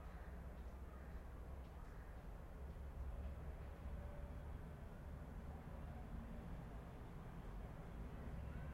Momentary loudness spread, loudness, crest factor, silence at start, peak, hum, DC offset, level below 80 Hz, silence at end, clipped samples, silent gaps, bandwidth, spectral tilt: 4 LU; -55 LUFS; 14 dB; 0 s; -38 dBFS; none; under 0.1%; -54 dBFS; 0 s; under 0.1%; none; 16 kHz; -7.5 dB/octave